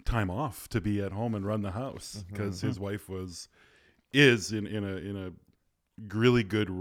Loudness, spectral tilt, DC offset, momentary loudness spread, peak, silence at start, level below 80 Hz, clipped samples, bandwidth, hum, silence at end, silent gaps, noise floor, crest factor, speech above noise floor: -30 LUFS; -5.5 dB/octave; under 0.1%; 18 LU; -6 dBFS; 0.05 s; -46 dBFS; under 0.1%; 16 kHz; none; 0 s; none; -71 dBFS; 24 dB; 41 dB